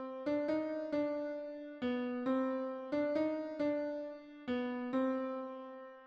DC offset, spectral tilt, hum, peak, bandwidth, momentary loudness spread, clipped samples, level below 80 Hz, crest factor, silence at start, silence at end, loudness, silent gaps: under 0.1%; -7 dB/octave; none; -24 dBFS; 6.6 kHz; 10 LU; under 0.1%; -76 dBFS; 14 dB; 0 s; 0 s; -38 LUFS; none